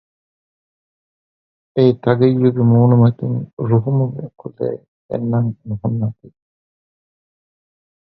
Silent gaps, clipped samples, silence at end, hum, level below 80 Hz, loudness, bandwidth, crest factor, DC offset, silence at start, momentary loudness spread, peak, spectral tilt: 3.53-3.57 s, 4.88-5.09 s; under 0.1%; 1.8 s; none; -54 dBFS; -17 LUFS; 4.8 kHz; 18 dB; under 0.1%; 1.75 s; 13 LU; 0 dBFS; -12 dB/octave